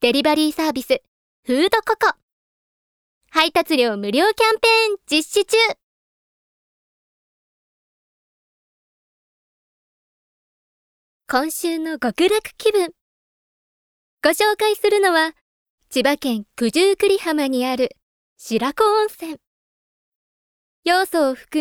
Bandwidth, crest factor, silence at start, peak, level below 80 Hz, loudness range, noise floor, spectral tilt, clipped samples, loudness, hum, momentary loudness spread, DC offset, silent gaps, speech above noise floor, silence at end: 19.5 kHz; 22 dB; 0 s; 0 dBFS; -60 dBFS; 6 LU; under -90 dBFS; -2.5 dB/octave; under 0.1%; -19 LUFS; none; 9 LU; under 0.1%; 1.08-1.43 s, 2.23-3.21 s, 5.83-11.20 s, 13.01-14.18 s, 15.41-15.78 s, 18.02-18.36 s, 19.47-20.83 s; over 72 dB; 0 s